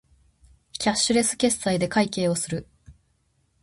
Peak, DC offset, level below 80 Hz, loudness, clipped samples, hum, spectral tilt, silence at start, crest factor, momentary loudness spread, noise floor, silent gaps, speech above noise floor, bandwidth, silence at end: -8 dBFS; under 0.1%; -54 dBFS; -23 LUFS; under 0.1%; none; -3.5 dB/octave; 0.75 s; 18 dB; 10 LU; -68 dBFS; none; 45 dB; 12 kHz; 0.7 s